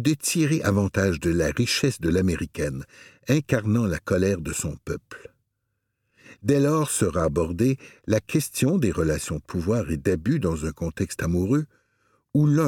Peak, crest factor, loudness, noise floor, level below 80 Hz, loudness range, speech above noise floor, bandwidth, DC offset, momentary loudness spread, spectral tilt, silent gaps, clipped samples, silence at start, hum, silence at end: -6 dBFS; 18 dB; -24 LUFS; -77 dBFS; -44 dBFS; 3 LU; 54 dB; 17.5 kHz; under 0.1%; 8 LU; -5.5 dB/octave; none; under 0.1%; 0 s; none; 0 s